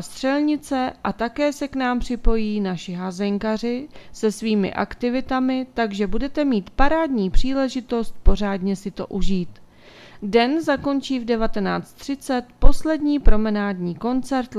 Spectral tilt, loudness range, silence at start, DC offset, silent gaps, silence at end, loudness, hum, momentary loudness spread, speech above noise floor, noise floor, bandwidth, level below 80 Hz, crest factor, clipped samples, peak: -6 dB/octave; 2 LU; 0 s; under 0.1%; none; 0 s; -23 LUFS; none; 6 LU; 27 dB; -46 dBFS; 11.5 kHz; -28 dBFS; 20 dB; under 0.1%; 0 dBFS